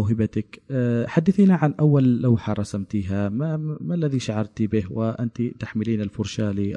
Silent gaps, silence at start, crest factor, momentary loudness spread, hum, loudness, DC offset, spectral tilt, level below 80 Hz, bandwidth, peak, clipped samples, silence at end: none; 0 s; 16 dB; 10 LU; none; -23 LUFS; under 0.1%; -8 dB/octave; -56 dBFS; 10.5 kHz; -4 dBFS; under 0.1%; 0 s